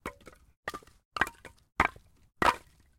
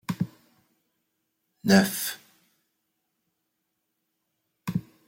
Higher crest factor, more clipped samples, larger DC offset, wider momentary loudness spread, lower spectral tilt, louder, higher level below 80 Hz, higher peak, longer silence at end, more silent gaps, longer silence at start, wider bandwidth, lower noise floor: about the same, 28 dB vs 26 dB; neither; neither; about the same, 15 LU vs 16 LU; second, -3.5 dB/octave vs -5 dB/octave; second, -31 LUFS vs -26 LUFS; first, -54 dBFS vs -68 dBFS; about the same, -6 dBFS vs -6 dBFS; first, 0.4 s vs 0.25 s; first, 0.57-0.63 s, 1.05-1.11 s vs none; about the same, 0.05 s vs 0.1 s; about the same, 16.5 kHz vs 16.5 kHz; second, -49 dBFS vs -79 dBFS